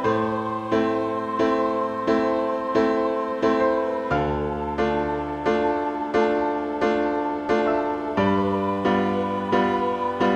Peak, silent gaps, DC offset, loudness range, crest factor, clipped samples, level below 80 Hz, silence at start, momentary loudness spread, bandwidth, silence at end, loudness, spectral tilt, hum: -8 dBFS; none; under 0.1%; 1 LU; 16 dB; under 0.1%; -46 dBFS; 0 s; 4 LU; 8.8 kHz; 0 s; -23 LUFS; -7 dB/octave; none